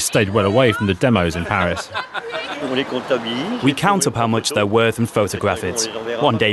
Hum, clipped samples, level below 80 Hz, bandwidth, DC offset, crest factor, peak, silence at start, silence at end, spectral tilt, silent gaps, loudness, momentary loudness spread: none; under 0.1%; -46 dBFS; 12.5 kHz; under 0.1%; 18 dB; -2 dBFS; 0 s; 0 s; -4.5 dB/octave; none; -19 LUFS; 8 LU